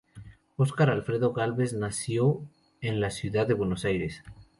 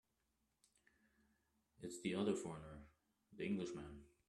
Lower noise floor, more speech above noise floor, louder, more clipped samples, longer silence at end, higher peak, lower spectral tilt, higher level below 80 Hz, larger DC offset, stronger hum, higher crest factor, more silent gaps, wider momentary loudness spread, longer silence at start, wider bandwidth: second, -49 dBFS vs -86 dBFS; second, 22 dB vs 41 dB; first, -28 LUFS vs -46 LUFS; neither; about the same, 0.15 s vs 0.2 s; first, -10 dBFS vs -28 dBFS; about the same, -6.5 dB/octave vs -5.5 dB/octave; first, -54 dBFS vs -72 dBFS; neither; neither; about the same, 18 dB vs 22 dB; neither; second, 11 LU vs 16 LU; second, 0.15 s vs 1.8 s; about the same, 11.5 kHz vs 12.5 kHz